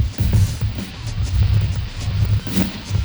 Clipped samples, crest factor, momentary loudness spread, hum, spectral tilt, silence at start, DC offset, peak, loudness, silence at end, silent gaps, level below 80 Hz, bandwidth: under 0.1%; 14 dB; 7 LU; none; -6 dB/octave; 0 s; under 0.1%; -6 dBFS; -21 LUFS; 0 s; none; -26 dBFS; over 20 kHz